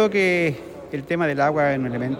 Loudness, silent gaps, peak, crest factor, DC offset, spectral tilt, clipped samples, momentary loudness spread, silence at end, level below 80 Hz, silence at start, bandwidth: -21 LUFS; none; -6 dBFS; 16 dB; under 0.1%; -6.5 dB/octave; under 0.1%; 14 LU; 0 s; -56 dBFS; 0 s; 16.5 kHz